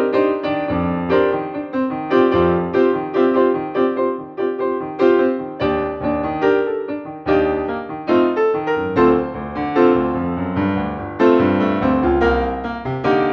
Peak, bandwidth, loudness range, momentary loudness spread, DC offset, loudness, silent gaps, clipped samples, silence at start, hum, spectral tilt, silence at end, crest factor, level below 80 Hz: -2 dBFS; 6.4 kHz; 2 LU; 8 LU; under 0.1%; -18 LUFS; none; under 0.1%; 0 s; none; -8.5 dB/octave; 0 s; 16 dB; -38 dBFS